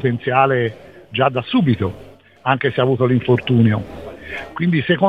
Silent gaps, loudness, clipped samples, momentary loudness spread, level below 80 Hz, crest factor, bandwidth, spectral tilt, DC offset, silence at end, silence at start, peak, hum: none; -18 LUFS; under 0.1%; 14 LU; -48 dBFS; 16 dB; 5 kHz; -9 dB/octave; 0.2%; 0 s; 0 s; -2 dBFS; none